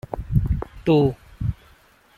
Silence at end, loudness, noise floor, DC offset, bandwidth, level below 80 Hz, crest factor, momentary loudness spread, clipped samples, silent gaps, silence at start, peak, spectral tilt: 0.65 s; -23 LUFS; -54 dBFS; under 0.1%; 13 kHz; -32 dBFS; 18 dB; 11 LU; under 0.1%; none; 0.1 s; -6 dBFS; -9.5 dB/octave